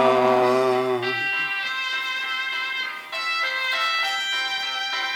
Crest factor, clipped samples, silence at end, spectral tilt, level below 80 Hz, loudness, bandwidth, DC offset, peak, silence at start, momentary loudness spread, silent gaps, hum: 18 dB; under 0.1%; 0 s; -3 dB/octave; -74 dBFS; -22 LUFS; 18.5 kHz; under 0.1%; -6 dBFS; 0 s; 6 LU; none; none